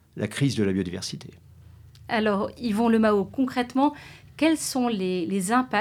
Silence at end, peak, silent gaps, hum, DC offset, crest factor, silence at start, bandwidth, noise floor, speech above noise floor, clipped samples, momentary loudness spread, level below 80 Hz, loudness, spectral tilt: 0 s; -8 dBFS; none; none; under 0.1%; 16 dB; 0.15 s; 16 kHz; -49 dBFS; 24 dB; under 0.1%; 10 LU; -56 dBFS; -25 LUFS; -5 dB/octave